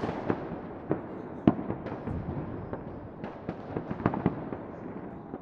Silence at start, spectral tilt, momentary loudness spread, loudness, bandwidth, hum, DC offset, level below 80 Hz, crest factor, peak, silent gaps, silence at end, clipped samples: 0 s; -10 dB/octave; 13 LU; -34 LUFS; 6.4 kHz; none; under 0.1%; -52 dBFS; 28 dB; -6 dBFS; none; 0 s; under 0.1%